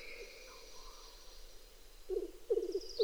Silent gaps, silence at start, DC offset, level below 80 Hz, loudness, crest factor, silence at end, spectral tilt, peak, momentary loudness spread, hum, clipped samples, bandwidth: none; 0 s; under 0.1%; -56 dBFS; -42 LUFS; 20 dB; 0 s; -3.5 dB/octave; -22 dBFS; 21 LU; none; under 0.1%; over 20 kHz